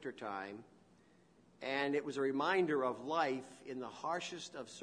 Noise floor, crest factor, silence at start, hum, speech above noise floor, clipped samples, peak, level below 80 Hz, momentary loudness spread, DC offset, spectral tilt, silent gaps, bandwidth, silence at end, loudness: -67 dBFS; 20 dB; 0 s; none; 29 dB; under 0.1%; -20 dBFS; -84 dBFS; 14 LU; under 0.1%; -4.5 dB/octave; none; 10.5 kHz; 0 s; -38 LUFS